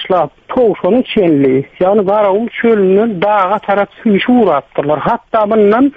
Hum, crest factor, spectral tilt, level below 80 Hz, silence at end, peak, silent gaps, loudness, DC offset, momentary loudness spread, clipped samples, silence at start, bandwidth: none; 10 dB; -9 dB/octave; -48 dBFS; 0.05 s; 0 dBFS; none; -12 LUFS; under 0.1%; 5 LU; under 0.1%; 0 s; 4.9 kHz